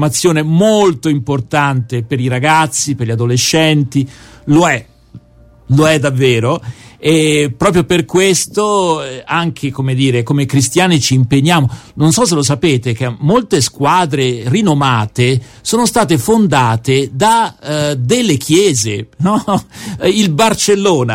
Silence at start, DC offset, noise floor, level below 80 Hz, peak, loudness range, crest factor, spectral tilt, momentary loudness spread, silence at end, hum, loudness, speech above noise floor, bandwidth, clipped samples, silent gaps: 0 s; under 0.1%; -43 dBFS; -44 dBFS; 0 dBFS; 1 LU; 12 dB; -5 dB/octave; 7 LU; 0 s; none; -12 LUFS; 31 dB; 16.5 kHz; under 0.1%; none